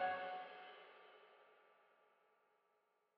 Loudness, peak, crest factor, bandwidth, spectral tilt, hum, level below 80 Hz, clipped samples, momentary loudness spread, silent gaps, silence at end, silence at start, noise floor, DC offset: -50 LUFS; -30 dBFS; 22 dB; 5.6 kHz; 0 dB/octave; none; under -90 dBFS; under 0.1%; 22 LU; none; 1.45 s; 0 s; -82 dBFS; under 0.1%